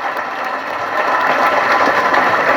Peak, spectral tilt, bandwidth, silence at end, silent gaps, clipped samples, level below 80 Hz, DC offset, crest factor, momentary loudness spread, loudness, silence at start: 0 dBFS; -3.5 dB/octave; 18 kHz; 0 s; none; under 0.1%; -60 dBFS; under 0.1%; 14 dB; 8 LU; -14 LUFS; 0 s